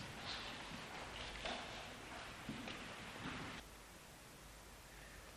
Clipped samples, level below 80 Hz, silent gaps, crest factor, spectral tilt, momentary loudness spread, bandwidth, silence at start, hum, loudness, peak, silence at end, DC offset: under 0.1%; -64 dBFS; none; 22 dB; -3 dB/octave; 11 LU; over 20 kHz; 0 s; none; -50 LUFS; -28 dBFS; 0 s; under 0.1%